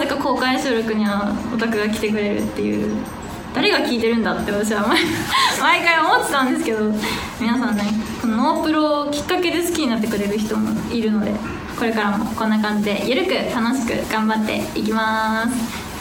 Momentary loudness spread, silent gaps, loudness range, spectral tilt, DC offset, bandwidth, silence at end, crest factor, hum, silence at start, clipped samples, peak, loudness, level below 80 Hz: 6 LU; none; 4 LU; -4.5 dB/octave; under 0.1%; 19.5 kHz; 0 s; 18 dB; none; 0 s; under 0.1%; -2 dBFS; -19 LUFS; -44 dBFS